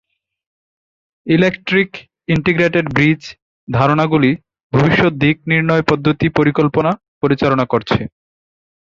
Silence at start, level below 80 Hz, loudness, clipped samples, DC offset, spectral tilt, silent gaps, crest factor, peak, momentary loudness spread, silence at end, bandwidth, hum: 1.25 s; -44 dBFS; -15 LUFS; under 0.1%; under 0.1%; -7.5 dB/octave; 3.42-3.67 s, 4.63-4.70 s, 7.08-7.21 s; 16 dB; 0 dBFS; 9 LU; 0.8 s; 7.4 kHz; none